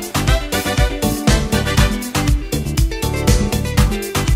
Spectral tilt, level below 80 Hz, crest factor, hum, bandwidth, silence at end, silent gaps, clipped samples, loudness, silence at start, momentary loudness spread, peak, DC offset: -4.5 dB/octave; -20 dBFS; 16 dB; none; 16.5 kHz; 0 s; none; under 0.1%; -17 LUFS; 0 s; 3 LU; 0 dBFS; under 0.1%